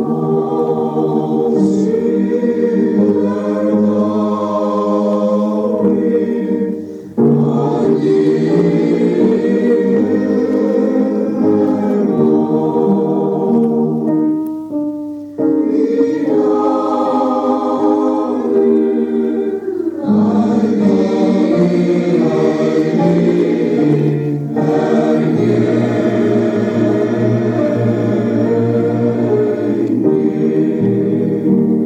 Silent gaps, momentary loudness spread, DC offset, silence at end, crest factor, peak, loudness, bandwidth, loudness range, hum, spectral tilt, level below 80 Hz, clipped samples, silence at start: none; 4 LU; under 0.1%; 0 s; 12 dB; 0 dBFS; -14 LUFS; 8.4 kHz; 2 LU; none; -9 dB/octave; -58 dBFS; under 0.1%; 0 s